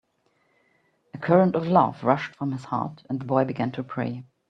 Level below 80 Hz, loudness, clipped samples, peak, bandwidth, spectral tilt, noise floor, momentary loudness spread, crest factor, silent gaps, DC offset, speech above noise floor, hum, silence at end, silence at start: -66 dBFS; -25 LUFS; under 0.1%; -4 dBFS; 7.8 kHz; -9 dB/octave; -69 dBFS; 12 LU; 22 dB; none; under 0.1%; 45 dB; none; 0.25 s; 1.15 s